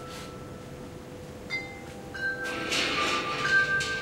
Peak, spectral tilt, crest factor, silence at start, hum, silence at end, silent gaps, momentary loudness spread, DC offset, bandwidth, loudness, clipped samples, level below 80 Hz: -14 dBFS; -2.5 dB/octave; 18 dB; 0 s; none; 0 s; none; 19 LU; under 0.1%; 16.5 kHz; -27 LUFS; under 0.1%; -54 dBFS